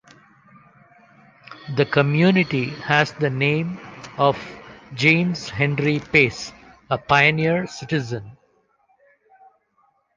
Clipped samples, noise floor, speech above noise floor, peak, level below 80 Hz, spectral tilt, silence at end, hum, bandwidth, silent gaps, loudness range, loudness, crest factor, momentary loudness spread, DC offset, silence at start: under 0.1%; -64 dBFS; 44 dB; -2 dBFS; -54 dBFS; -6 dB/octave; 1.85 s; none; 7.6 kHz; none; 4 LU; -20 LUFS; 20 dB; 17 LU; under 0.1%; 1.5 s